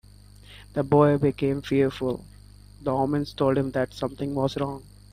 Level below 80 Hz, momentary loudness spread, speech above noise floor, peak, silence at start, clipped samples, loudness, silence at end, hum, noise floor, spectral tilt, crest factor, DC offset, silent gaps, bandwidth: -50 dBFS; 12 LU; 25 dB; -6 dBFS; 0.5 s; under 0.1%; -25 LUFS; 0.3 s; 50 Hz at -45 dBFS; -49 dBFS; -8 dB/octave; 20 dB; under 0.1%; none; 14 kHz